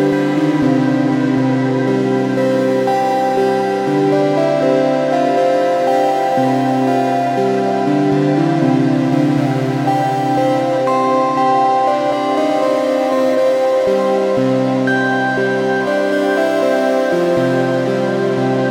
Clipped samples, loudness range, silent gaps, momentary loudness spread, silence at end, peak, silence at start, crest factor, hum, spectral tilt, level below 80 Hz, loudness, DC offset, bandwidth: under 0.1%; 1 LU; none; 2 LU; 0 s; -2 dBFS; 0 s; 12 dB; none; -7 dB/octave; -58 dBFS; -15 LUFS; under 0.1%; 16 kHz